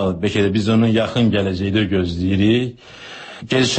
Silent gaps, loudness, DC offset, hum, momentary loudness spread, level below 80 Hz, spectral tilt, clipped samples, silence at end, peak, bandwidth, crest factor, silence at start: none; -18 LUFS; under 0.1%; none; 18 LU; -44 dBFS; -6 dB/octave; under 0.1%; 0 s; -4 dBFS; 8.6 kHz; 14 dB; 0 s